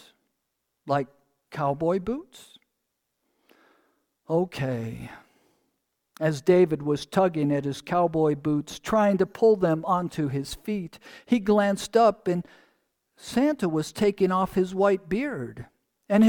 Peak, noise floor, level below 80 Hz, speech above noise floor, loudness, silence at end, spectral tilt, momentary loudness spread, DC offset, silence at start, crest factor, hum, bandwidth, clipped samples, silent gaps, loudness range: -8 dBFS; -80 dBFS; -56 dBFS; 55 dB; -25 LUFS; 0 s; -6.5 dB/octave; 12 LU; under 0.1%; 0.85 s; 18 dB; none; 18.5 kHz; under 0.1%; none; 9 LU